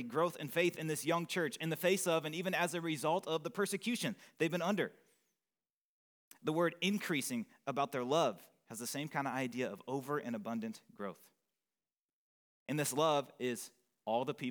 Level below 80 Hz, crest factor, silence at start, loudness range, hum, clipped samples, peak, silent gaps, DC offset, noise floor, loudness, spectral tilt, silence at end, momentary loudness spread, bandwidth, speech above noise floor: under -90 dBFS; 20 dB; 0 s; 6 LU; none; under 0.1%; -18 dBFS; 5.72-6.31 s, 12.13-12.66 s; under 0.1%; under -90 dBFS; -37 LUFS; -4.5 dB/octave; 0 s; 10 LU; over 20 kHz; over 53 dB